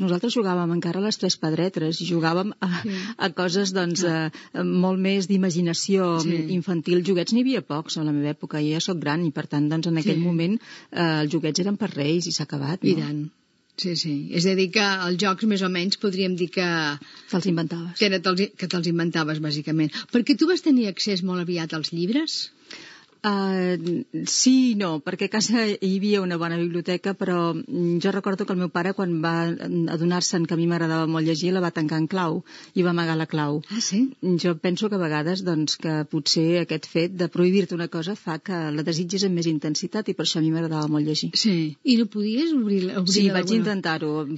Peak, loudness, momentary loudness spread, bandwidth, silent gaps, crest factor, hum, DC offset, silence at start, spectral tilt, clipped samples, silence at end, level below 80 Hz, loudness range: -4 dBFS; -23 LUFS; 6 LU; 8 kHz; none; 20 dB; none; under 0.1%; 0 s; -5 dB/octave; under 0.1%; 0 s; -78 dBFS; 2 LU